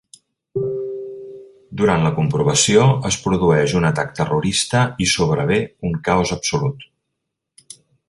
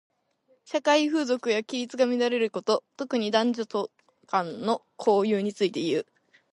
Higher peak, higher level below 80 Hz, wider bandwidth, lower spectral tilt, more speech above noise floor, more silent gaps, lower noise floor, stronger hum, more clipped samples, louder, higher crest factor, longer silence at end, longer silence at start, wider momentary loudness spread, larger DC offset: first, -2 dBFS vs -8 dBFS; first, -44 dBFS vs -78 dBFS; about the same, 11.5 kHz vs 11.5 kHz; about the same, -4.5 dB/octave vs -4.5 dB/octave; first, 61 dB vs 41 dB; neither; first, -78 dBFS vs -67 dBFS; neither; neither; first, -18 LUFS vs -26 LUFS; about the same, 18 dB vs 18 dB; first, 1.25 s vs 0.55 s; second, 0.55 s vs 0.7 s; first, 14 LU vs 8 LU; neither